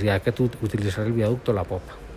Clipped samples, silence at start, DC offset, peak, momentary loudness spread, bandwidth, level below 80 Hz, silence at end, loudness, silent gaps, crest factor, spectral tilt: under 0.1%; 0 s; under 0.1%; -8 dBFS; 5 LU; 15.5 kHz; -42 dBFS; 0 s; -25 LUFS; none; 16 dB; -7.5 dB/octave